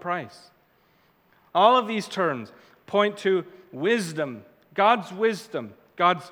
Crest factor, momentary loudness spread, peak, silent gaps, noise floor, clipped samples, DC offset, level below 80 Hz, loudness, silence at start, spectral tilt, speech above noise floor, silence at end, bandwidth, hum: 22 dB; 16 LU; -4 dBFS; none; -63 dBFS; under 0.1%; under 0.1%; -78 dBFS; -24 LUFS; 0 s; -5 dB/octave; 38 dB; 0 s; 18 kHz; none